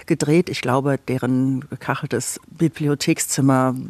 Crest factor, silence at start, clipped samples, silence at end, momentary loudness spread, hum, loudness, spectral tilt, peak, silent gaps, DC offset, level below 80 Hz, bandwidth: 16 dB; 0.1 s; under 0.1%; 0 s; 8 LU; none; -20 LUFS; -5.5 dB/octave; -4 dBFS; none; under 0.1%; -58 dBFS; 14 kHz